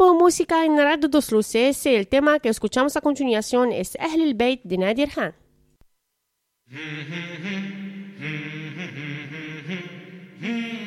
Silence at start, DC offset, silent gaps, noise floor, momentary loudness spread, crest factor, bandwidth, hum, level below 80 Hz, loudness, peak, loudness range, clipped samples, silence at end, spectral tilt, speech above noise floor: 0 s; under 0.1%; none; -76 dBFS; 15 LU; 18 dB; 15.5 kHz; none; -54 dBFS; -22 LUFS; -4 dBFS; 13 LU; under 0.1%; 0 s; -4.5 dB/octave; 55 dB